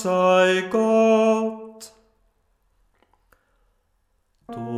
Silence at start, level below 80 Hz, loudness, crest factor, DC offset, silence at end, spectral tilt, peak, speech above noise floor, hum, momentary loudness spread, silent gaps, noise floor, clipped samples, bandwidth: 0 s; -66 dBFS; -19 LUFS; 16 dB; under 0.1%; 0 s; -5.5 dB/octave; -6 dBFS; 49 dB; none; 21 LU; none; -68 dBFS; under 0.1%; 13.5 kHz